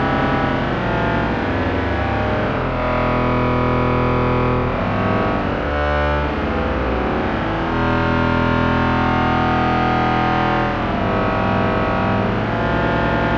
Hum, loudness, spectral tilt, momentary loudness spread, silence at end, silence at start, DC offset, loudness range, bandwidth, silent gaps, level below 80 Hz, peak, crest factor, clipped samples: none; -18 LUFS; -8 dB/octave; 3 LU; 0 s; 0 s; under 0.1%; 2 LU; 7.2 kHz; none; -28 dBFS; -4 dBFS; 14 dB; under 0.1%